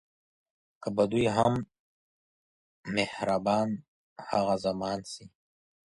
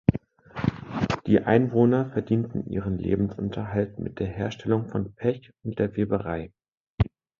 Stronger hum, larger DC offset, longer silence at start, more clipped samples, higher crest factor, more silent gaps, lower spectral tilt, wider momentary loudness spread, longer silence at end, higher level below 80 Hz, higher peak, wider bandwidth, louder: neither; neither; first, 0.8 s vs 0.1 s; neither; about the same, 22 dB vs 22 dB; first, 1.79-2.83 s, 3.88-4.16 s vs 6.80-6.98 s; second, -6 dB/octave vs -9 dB/octave; first, 18 LU vs 11 LU; first, 0.7 s vs 0.35 s; second, -62 dBFS vs -44 dBFS; second, -10 dBFS vs -4 dBFS; first, 11.5 kHz vs 7.4 kHz; second, -29 LUFS vs -26 LUFS